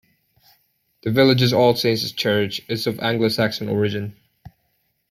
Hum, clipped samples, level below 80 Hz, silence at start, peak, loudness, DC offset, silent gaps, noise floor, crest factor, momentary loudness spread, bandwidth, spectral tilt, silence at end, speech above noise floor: none; under 0.1%; -58 dBFS; 1.05 s; -4 dBFS; -20 LUFS; under 0.1%; none; -69 dBFS; 18 dB; 9 LU; 16 kHz; -5.5 dB/octave; 0.6 s; 49 dB